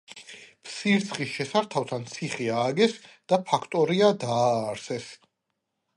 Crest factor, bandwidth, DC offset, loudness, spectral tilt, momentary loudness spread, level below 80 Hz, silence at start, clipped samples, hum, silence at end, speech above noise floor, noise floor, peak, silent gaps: 20 dB; 11.5 kHz; under 0.1%; -26 LUFS; -5 dB/octave; 20 LU; -72 dBFS; 0.1 s; under 0.1%; none; 0.8 s; 55 dB; -81 dBFS; -6 dBFS; none